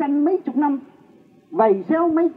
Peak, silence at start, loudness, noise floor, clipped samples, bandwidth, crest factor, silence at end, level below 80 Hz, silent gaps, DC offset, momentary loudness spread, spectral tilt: -6 dBFS; 0 s; -20 LUFS; -51 dBFS; under 0.1%; 4.2 kHz; 14 dB; 0.05 s; -72 dBFS; none; under 0.1%; 8 LU; -10 dB/octave